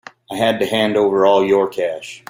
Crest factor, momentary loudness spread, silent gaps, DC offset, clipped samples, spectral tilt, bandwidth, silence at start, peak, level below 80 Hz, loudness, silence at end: 14 dB; 10 LU; none; under 0.1%; under 0.1%; -5 dB/octave; 16.5 kHz; 0.3 s; -2 dBFS; -60 dBFS; -16 LUFS; 0.1 s